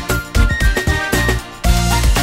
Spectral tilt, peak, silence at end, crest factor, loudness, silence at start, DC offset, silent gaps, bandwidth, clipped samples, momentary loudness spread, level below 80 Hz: -4 dB/octave; 0 dBFS; 0 s; 14 dB; -16 LUFS; 0 s; under 0.1%; none; 16.5 kHz; under 0.1%; 4 LU; -18 dBFS